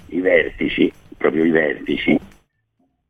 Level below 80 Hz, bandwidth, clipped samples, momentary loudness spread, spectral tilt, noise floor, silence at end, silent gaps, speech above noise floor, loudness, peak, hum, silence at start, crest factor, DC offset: -46 dBFS; 6.4 kHz; under 0.1%; 5 LU; -7.5 dB/octave; -67 dBFS; 0.85 s; none; 49 dB; -18 LUFS; -2 dBFS; none; 0.1 s; 18 dB; 0.2%